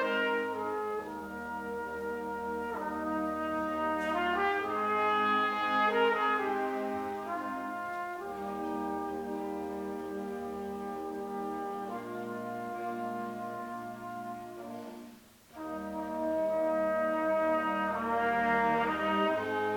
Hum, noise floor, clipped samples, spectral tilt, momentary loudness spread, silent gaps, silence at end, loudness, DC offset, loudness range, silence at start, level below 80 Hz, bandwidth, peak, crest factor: none; -54 dBFS; under 0.1%; -5.5 dB/octave; 12 LU; none; 0 s; -33 LUFS; under 0.1%; 10 LU; 0 s; -64 dBFS; 19 kHz; -16 dBFS; 16 dB